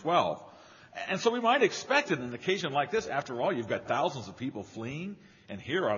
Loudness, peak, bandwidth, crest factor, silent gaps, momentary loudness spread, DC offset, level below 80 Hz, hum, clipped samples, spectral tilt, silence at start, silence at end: -30 LUFS; -10 dBFS; 7.2 kHz; 20 dB; none; 16 LU; under 0.1%; -70 dBFS; none; under 0.1%; -3 dB/octave; 0 s; 0 s